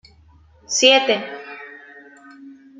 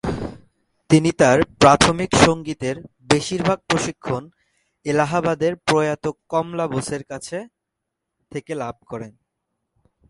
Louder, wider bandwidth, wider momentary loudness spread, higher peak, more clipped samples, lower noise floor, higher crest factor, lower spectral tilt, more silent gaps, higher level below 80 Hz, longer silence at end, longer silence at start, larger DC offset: first, -16 LUFS vs -20 LUFS; second, 9.6 kHz vs 11.5 kHz; first, 23 LU vs 18 LU; about the same, 0 dBFS vs 0 dBFS; neither; second, -51 dBFS vs -81 dBFS; about the same, 22 dB vs 20 dB; second, -0.5 dB/octave vs -4.5 dB/octave; neither; second, -62 dBFS vs -44 dBFS; second, 0.25 s vs 1 s; first, 0.7 s vs 0.05 s; neither